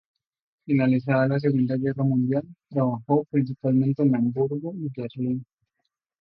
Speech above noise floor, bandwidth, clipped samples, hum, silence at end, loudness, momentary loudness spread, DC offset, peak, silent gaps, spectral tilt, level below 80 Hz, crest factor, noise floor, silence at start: 57 dB; 5.4 kHz; under 0.1%; none; 0.8 s; -24 LUFS; 9 LU; under 0.1%; -8 dBFS; none; -12 dB/octave; -66 dBFS; 16 dB; -80 dBFS; 0.65 s